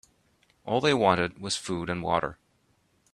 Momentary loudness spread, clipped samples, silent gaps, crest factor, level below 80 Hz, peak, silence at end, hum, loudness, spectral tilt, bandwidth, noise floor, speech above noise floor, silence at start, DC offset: 9 LU; under 0.1%; none; 22 dB; -60 dBFS; -6 dBFS; 0.8 s; none; -27 LUFS; -4.5 dB/octave; 13 kHz; -68 dBFS; 42 dB; 0.65 s; under 0.1%